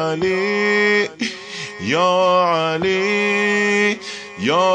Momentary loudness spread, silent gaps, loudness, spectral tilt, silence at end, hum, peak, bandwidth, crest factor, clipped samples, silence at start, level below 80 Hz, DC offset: 11 LU; none; -17 LUFS; -4 dB/octave; 0 s; none; -6 dBFS; 9.8 kHz; 12 dB; under 0.1%; 0 s; -58 dBFS; under 0.1%